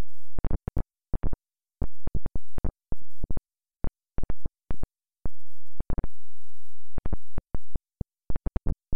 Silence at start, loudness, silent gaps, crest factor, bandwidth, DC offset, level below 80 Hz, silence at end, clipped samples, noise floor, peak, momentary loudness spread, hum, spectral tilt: 0 s; -39 LUFS; none; 4 dB; 2.5 kHz; under 0.1%; -34 dBFS; 0 s; under 0.1%; under -90 dBFS; -18 dBFS; 10 LU; none; -10 dB/octave